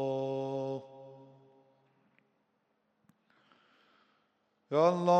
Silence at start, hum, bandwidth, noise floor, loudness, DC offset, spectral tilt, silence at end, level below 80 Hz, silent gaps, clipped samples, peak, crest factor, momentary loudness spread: 0 s; none; 8.8 kHz; -77 dBFS; -33 LUFS; under 0.1%; -7 dB/octave; 0 s; -88 dBFS; none; under 0.1%; -14 dBFS; 22 dB; 25 LU